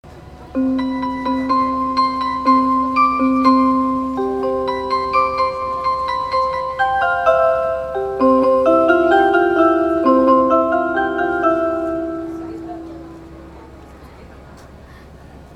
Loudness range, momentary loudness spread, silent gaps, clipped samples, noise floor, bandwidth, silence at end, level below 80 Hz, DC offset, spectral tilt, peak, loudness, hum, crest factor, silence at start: 9 LU; 11 LU; none; under 0.1%; -39 dBFS; 8.8 kHz; 0 s; -44 dBFS; under 0.1%; -6.5 dB/octave; 0 dBFS; -16 LUFS; none; 16 dB; 0.05 s